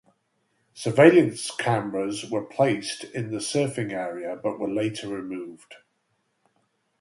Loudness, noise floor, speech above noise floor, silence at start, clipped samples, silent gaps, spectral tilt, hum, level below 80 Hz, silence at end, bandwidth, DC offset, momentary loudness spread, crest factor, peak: -24 LUFS; -73 dBFS; 49 dB; 0.75 s; under 0.1%; none; -5.5 dB/octave; none; -68 dBFS; 1.25 s; 11.5 kHz; under 0.1%; 16 LU; 24 dB; -2 dBFS